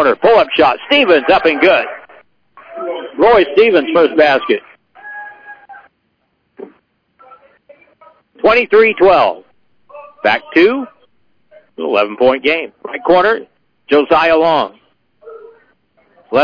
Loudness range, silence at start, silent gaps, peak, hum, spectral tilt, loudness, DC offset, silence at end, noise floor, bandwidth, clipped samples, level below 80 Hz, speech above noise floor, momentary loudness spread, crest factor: 4 LU; 0 s; none; 0 dBFS; none; -6 dB/octave; -12 LUFS; under 0.1%; 0 s; -64 dBFS; 5.4 kHz; under 0.1%; -50 dBFS; 53 dB; 16 LU; 14 dB